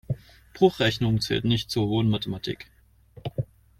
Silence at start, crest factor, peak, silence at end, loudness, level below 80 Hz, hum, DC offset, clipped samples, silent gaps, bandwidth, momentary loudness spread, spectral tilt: 0.1 s; 22 dB; -4 dBFS; 0.35 s; -26 LUFS; -50 dBFS; none; under 0.1%; under 0.1%; none; 15.5 kHz; 13 LU; -6 dB/octave